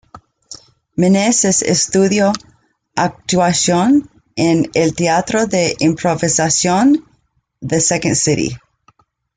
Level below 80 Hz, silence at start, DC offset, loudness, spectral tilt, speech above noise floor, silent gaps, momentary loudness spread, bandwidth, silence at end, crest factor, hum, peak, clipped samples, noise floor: -48 dBFS; 0.15 s; under 0.1%; -14 LUFS; -4 dB/octave; 46 dB; none; 14 LU; 9.6 kHz; 0.8 s; 14 dB; none; -2 dBFS; under 0.1%; -60 dBFS